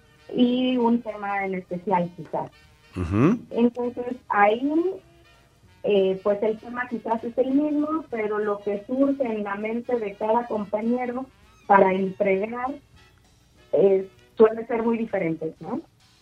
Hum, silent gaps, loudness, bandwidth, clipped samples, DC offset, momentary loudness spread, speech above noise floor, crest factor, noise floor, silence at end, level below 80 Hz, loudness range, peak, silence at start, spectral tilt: none; none; -24 LUFS; 7.6 kHz; under 0.1%; under 0.1%; 12 LU; 34 dB; 22 dB; -57 dBFS; 0.4 s; -56 dBFS; 2 LU; -2 dBFS; 0.3 s; -8 dB/octave